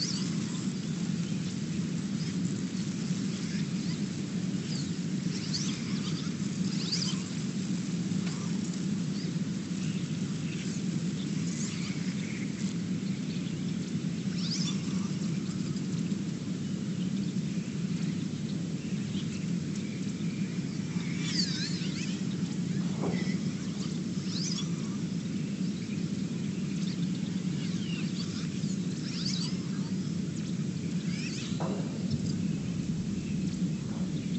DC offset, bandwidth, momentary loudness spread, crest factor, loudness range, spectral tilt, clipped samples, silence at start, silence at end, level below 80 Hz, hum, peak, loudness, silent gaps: under 0.1%; 8.6 kHz; 3 LU; 16 dB; 1 LU; -5.5 dB/octave; under 0.1%; 0 s; 0 s; -62 dBFS; none; -16 dBFS; -33 LUFS; none